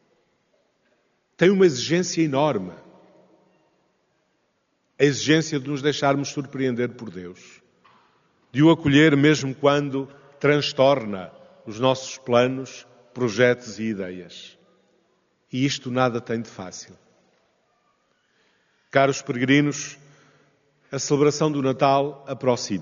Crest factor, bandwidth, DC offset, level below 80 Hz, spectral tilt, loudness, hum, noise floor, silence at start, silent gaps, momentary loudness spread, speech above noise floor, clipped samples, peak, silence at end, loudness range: 20 dB; 7.4 kHz; under 0.1%; -64 dBFS; -4.5 dB/octave; -22 LUFS; none; -70 dBFS; 1.4 s; none; 19 LU; 49 dB; under 0.1%; -4 dBFS; 0 s; 8 LU